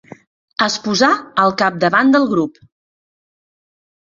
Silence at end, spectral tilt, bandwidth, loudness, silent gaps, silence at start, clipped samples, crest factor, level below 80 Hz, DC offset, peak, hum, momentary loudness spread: 1.65 s; -4 dB/octave; 7.6 kHz; -15 LUFS; none; 0.6 s; under 0.1%; 18 dB; -60 dBFS; under 0.1%; 0 dBFS; none; 7 LU